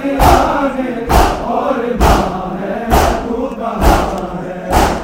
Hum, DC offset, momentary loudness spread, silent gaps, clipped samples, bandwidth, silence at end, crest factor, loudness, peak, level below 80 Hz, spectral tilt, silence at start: none; under 0.1%; 9 LU; none; under 0.1%; 16.5 kHz; 0 s; 14 dB; -14 LUFS; 0 dBFS; -20 dBFS; -5.5 dB/octave; 0 s